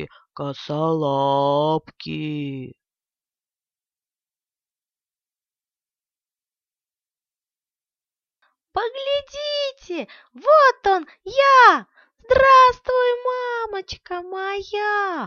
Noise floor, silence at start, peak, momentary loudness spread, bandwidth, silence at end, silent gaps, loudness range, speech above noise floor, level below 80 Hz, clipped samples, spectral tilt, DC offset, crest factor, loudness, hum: under -90 dBFS; 0 s; -2 dBFS; 19 LU; 7 kHz; 0 s; none; 19 LU; over 71 dB; -54 dBFS; under 0.1%; -5 dB/octave; under 0.1%; 20 dB; -19 LUFS; none